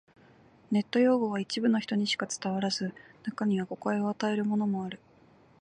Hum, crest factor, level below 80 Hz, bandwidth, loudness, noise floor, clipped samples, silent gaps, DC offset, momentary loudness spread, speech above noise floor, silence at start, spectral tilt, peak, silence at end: none; 16 dB; -74 dBFS; 10 kHz; -30 LUFS; -60 dBFS; under 0.1%; none; under 0.1%; 11 LU; 31 dB; 0.7 s; -5 dB/octave; -14 dBFS; 0.65 s